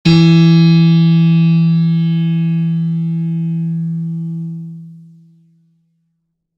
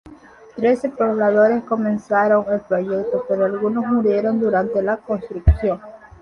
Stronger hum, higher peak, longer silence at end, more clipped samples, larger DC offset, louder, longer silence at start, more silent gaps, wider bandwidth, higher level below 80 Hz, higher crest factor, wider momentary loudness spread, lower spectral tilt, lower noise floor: neither; about the same, 0 dBFS vs -2 dBFS; first, 1.6 s vs 0.25 s; neither; neither; first, -13 LUFS vs -19 LUFS; about the same, 0.05 s vs 0.05 s; neither; second, 5.8 kHz vs 8.8 kHz; second, -48 dBFS vs -30 dBFS; about the same, 12 dB vs 16 dB; first, 15 LU vs 6 LU; about the same, -8.5 dB/octave vs -9.5 dB/octave; first, -69 dBFS vs -44 dBFS